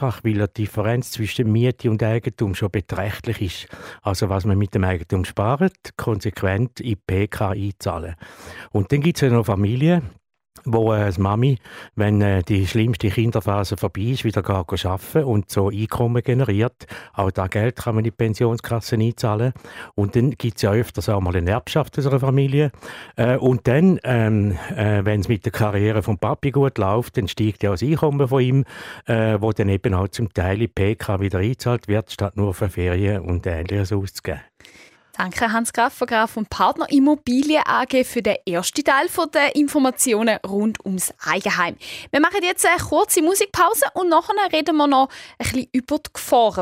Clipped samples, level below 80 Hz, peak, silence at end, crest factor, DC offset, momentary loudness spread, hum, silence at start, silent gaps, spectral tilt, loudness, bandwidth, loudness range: under 0.1%; -44 dBFS; -4 dBFS; 0 s; 16 dB; under 0.1%; 8 LU; none; 0 s; none; -6 dB/octave; -20 LUFS; 16 kHz; 4 LU